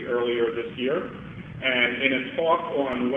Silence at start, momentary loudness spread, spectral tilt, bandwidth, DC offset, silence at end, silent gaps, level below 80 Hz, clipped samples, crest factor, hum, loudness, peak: 0 s; 10 LU; -7 dB/octave; 4 kHz; under 0.1%; 0 s; none; -56 dBFS; under 0.1%; 22 dB; none; -24 LUFS; -4 dBFS